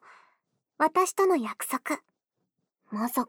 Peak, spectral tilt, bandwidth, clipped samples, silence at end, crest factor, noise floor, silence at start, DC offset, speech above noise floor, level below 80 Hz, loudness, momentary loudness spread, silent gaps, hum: -12 dBFS; -3.5 dB/octave; over 20 kHz; under 0.1%; 0.05 s; 18 dB; -81 dBFS; 0.8 s; under 0.1%; 54 dB; -78 dBFS; -27 LUFS; 10 LU; none; none